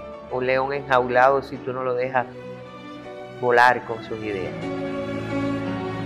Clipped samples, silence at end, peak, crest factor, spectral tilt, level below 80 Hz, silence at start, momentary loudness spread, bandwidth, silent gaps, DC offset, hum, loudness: under 0.1%; 0 s; -4 dBFS; 20 dB; -6.5 dB/octave; -54 dBFS; 0 s; 20 LU; 14 kHz; none; under 0.1%; none; -23 LUFS